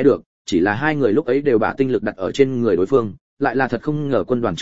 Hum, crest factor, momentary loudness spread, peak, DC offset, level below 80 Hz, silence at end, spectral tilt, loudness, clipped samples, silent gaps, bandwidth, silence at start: none; 16 dB; 6 LU; -2 dBFS; 1%; -50 dBFS; 0 s; -7 dB/octave; -19 LUFS; under 0.1%; 0.26-0.45 s, 3.21-3.37 s; 7.8 kHz; 0 s